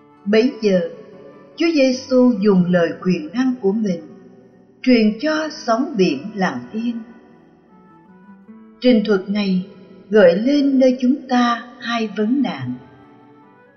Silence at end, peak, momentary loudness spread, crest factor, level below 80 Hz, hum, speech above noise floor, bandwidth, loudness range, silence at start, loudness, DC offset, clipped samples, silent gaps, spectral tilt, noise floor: 1 s; -2 dBFS; 11 LU; 16 dB; -58 dBFS; none; 32 dB; 6.6 kHz; 6 LU; 0.25 s; -18 LUFS; under 0.1%; under 0.1%; none; -6.5 dB/octave; -48 dBFS